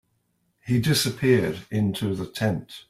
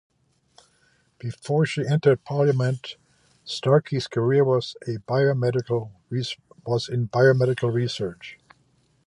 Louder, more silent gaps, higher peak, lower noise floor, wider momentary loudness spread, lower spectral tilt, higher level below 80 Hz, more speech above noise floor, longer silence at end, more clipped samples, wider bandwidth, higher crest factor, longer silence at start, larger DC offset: about the same, -24 LUFS vs -23 LUFS; neither; about the same, -8 dBFS vs -6 dBFS; first, -71 dBFS vs -64 dBFS; second, 7 LU vs 15 LU; second, -5.5 dB/octave vs -7 dB/octave; first, -54 dBFS vs -62 dBFS; first, 47 dB vs 41 dB; second, 0.1 s vs 0.75 s; neither; first, 16 kHz vs 10.5 kHz; about the same, 18 dB vs 18 dB; second, 0.65 s vs 1.25 s; neither